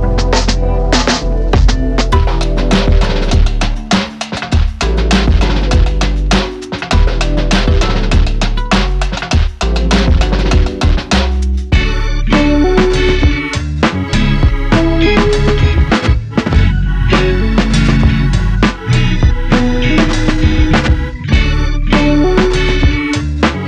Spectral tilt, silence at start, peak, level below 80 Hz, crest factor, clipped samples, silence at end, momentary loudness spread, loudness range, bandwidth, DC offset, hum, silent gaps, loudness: -5.5 dB/octave; 0 s; 0 dBFS; -14 dBFS; 10 dB; under 0.1%; 0 s; 5 LU; 2 LU; 9.6 kHz; under 0.1%; none; none; -13 LUFS